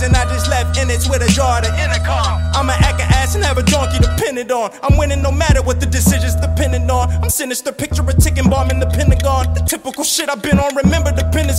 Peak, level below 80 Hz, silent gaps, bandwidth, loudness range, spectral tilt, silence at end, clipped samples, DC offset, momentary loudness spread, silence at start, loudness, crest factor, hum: 0 dBFS; -18 dBFS; none; 16.5 kHz; 1 LU; -4.5 dB/octave; 0 s; under 0.1%; under 0.1%; 4 LU; 0 s; -15 LUFS; 14 dB; none